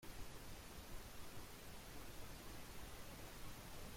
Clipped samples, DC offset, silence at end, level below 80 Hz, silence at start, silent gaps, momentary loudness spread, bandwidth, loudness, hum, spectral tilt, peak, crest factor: under 0.1%; under 0.1%; 0 s; -58 dBFS; 0 s; none; 1 LU; 16.5 kHz; -56 LUFS; none; -3.5 dB/octave; -38 dBFS; 14 dB